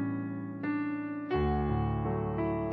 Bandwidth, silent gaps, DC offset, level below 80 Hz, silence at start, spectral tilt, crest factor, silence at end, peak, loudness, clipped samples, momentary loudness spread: 4.9 kHz; none; under 0.1%; -42 dBFS; 0 s; -11 dB/octave; 12 dB; 0 s; -20 dBFS; -33 LUFS; under 0.1%; 6 LU